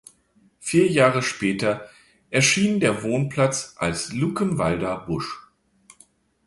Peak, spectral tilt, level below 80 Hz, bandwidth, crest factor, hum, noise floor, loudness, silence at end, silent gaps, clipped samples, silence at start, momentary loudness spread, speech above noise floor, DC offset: -4 dBFS; -4.5 dB/octave; -52 dBFS; 11.5 kHz; 18 dB; none; -61 dBFS; -22 LUFS; 1.05 s; none; under 0.1%; 0.6 s; 11 LU; 39 dB; under 0.1%